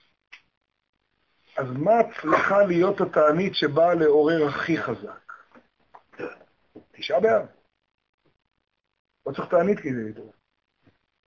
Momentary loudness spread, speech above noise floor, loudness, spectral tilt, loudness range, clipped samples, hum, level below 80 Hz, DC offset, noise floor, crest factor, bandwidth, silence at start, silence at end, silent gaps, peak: 19 LU; 49 dB; -22 LUFS; -7 dB/octave; 9 LU; under 0.1%; none; -64 dBFS; under 0.1%; -71 dBFS; 18 dB; 7 kHz; 1.55 s; 1 s; 8.09-8.18 s, 8.99-9.05 s; -6 dBFS